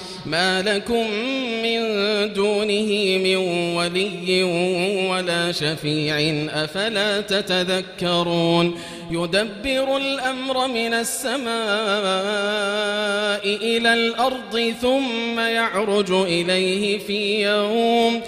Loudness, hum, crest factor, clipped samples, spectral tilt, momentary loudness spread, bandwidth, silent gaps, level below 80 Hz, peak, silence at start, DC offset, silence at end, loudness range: -21 LUFS; none; 16 dB; under 0.1%; -4 dB/octave; 4 LU; 15.5 kHz; none; -54 dBFS; -4 dBFS; 0 s; under 0.1%; 0 s; 2 LU